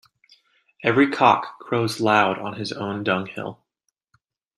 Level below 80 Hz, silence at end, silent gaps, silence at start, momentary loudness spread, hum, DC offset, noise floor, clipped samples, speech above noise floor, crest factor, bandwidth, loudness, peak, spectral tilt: -66 dBFS; 1.05 s; none; 0.8 s; 13 LU; none; under 0.1%; -77 dBFS; under 0.1%; 56 dB; 22 dB; 12.5 kHz; -21 LUFS; -2 dBFS; -5.5 dB/octave